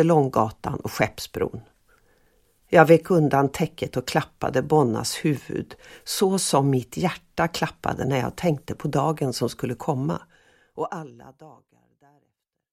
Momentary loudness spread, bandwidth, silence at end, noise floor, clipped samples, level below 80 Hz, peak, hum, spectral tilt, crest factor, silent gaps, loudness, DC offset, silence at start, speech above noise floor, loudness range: 13 LU; 16 kHz; 1.25 s; -75 dBFS; under 0.1%; -54 dBFS; 0 dBFS; none; -5.5 dB/octave; 24 dB; none; -23 LUFS; under 0.1%; 0 s; 52 dB; 7 LU